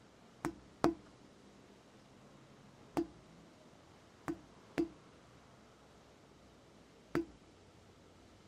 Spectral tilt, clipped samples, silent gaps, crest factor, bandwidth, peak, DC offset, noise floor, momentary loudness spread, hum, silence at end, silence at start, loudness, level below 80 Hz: -6 dB/octave; under 0.1%; none; 36 dB; 14 kHz; -10 dBFS; under 0.1%; -62 dBFS; 21 LU; none; 1.15 s; 0.45 s; -42 LUFS; -68 dBFS